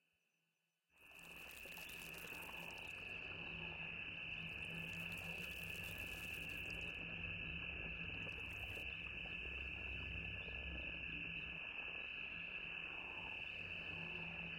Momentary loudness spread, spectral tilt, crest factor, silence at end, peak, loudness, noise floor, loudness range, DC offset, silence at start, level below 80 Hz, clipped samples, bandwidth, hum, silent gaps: 4 LU; -3.5 dB/octave; 14 dB; 0 s; -34 dBFS; -47 LUFS; -88 dBFS; 3 LU; under 0.1%; 0.95 s; -62 dBFS; under 0.1%; 17 kHz; none; none